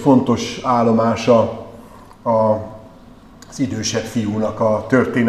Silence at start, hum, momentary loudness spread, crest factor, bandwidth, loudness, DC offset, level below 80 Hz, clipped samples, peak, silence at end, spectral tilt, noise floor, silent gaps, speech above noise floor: 0 s; none; 12 LU; 18 dB; 13 kHz; -18 LUFS; 0.1%; -48 dBFS; under 0.1%; 0 dBFS; 0 s; -6 dB/octave; -42 dBFS; none; 26 dB